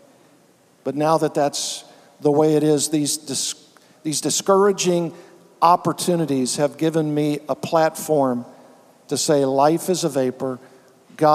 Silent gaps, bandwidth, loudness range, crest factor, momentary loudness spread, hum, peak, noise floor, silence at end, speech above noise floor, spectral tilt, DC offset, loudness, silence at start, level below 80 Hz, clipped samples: none; 16 kHz; 2 LU; 20 dB; 12 LU; none; 0 dBFS; -55 dBFS; 0 s; 36 dB; -4.5 dB/octave; under 0.1%; -20 LUFS; 0.85 s; -74 dBFS; under 0.1%